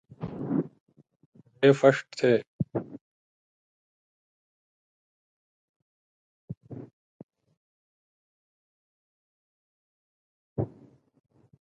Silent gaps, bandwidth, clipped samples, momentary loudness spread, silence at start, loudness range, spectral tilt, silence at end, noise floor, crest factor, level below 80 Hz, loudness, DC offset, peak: 0.80-0.86 s, 1.26-1.33 s, 2.47-2.59 s, 3.01-6.48 s, 6.57-6.61 s, 6.93-7.29 s, 7.57-10.56 s; 9 kHz; under 0.1%; 24 LU; 0.2 s; 24 LU; -7 dB/octave; 1 s; -57 dBFS; 28 dB; -64 dBFS; -26 LUFS; under 0.1%; -6 dBFS